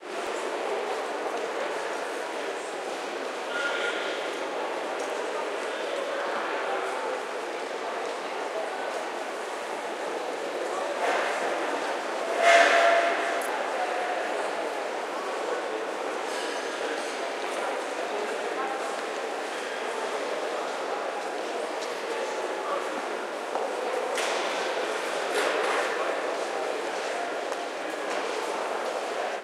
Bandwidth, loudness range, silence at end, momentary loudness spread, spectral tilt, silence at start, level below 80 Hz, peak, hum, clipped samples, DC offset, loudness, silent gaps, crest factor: 16 kHz; 7 LU; 0 s; 6 LU; -1 dB/octave; 0 s; -90 dBFS; -6 dBFS; none; under 0.1%; under 0.1%; -29 LUFS; none; 22 dB